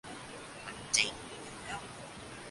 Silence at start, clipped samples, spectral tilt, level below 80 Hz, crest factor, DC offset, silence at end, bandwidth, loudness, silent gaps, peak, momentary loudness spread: 0.05 s; under 0.1%; -1 dB/octave; -62 dBFS; 30 dB; under 0.1%; 0 s; 11.5 kHz; -36 LUFS; none; -10 dBFS; 17 LU